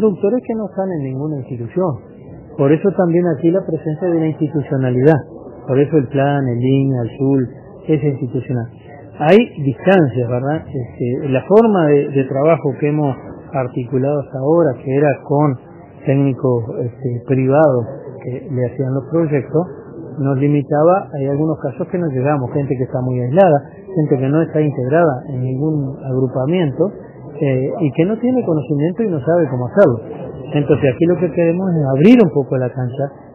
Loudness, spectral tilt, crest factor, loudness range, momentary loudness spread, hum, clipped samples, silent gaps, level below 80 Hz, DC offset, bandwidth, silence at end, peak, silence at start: -16 LUFS; -6.5 dB/octave; 16 dB; 3 LU; 11 LU; none; under 0.1%; none; -52 dBFS; under 0.1%; 3.5 kHz; 0 s; 0 dBFS; 0 s